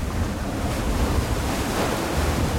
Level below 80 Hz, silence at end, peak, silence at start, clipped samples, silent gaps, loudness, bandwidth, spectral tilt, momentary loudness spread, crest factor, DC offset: -28 dBFS; 0 s; -10 dBFS; 0 s; under 0.1%; none; -25 LUFS; 16.5 kHz; -5 dB/octave; 3 LU; 14 dB; under 0.1%